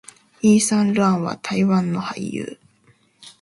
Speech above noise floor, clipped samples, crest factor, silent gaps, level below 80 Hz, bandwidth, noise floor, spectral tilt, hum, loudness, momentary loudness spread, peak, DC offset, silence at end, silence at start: 39 dB; under 0.1%; 16 dB; none; -60 dBFS; 11.5 kHz; -58 dBFS; -5.5 dB/octave; none; -20 LUFS; 12 LU; -6 dBFS; under 0.1%; 0.1 s; 0.45 s